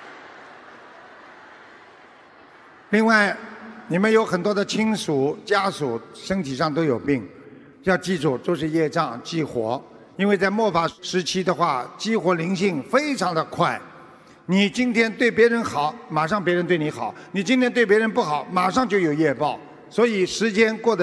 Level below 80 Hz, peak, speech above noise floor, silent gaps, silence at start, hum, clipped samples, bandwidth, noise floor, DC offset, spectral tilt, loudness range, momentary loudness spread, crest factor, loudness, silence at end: -60 dBFS; -4 dBFS; 27 dB; none; 0 s; none; under 0.1%; 11 kHz; -49 dBFS; under 0.1%; -5 dB/octave; 4 LU; 10 LU; 20 dB; -22 LUFS; 0 s